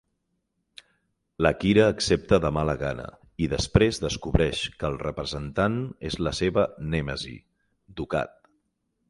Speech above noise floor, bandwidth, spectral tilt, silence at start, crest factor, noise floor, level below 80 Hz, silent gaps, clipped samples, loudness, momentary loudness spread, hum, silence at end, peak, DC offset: 51 dB; 11.5 kHz; -5.5 dB/octave; 1.4 s; 24 dB; -76 dBFS; -40 dBFS; none; under 0.1%; -25 LUFS; 12 LU; none; 0.8 s; -2 dBFS; under 0.1%